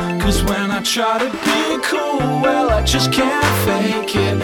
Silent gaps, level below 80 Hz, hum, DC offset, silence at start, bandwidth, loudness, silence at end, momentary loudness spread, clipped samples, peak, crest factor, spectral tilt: none; -28 dBFS; none; under 0.1%; 0 s; 19.5 kHz; -16 LUFS; 0 s; 3 LU; under 0.1%; -2 dBFS; 14 dB; -4.5 dB/octave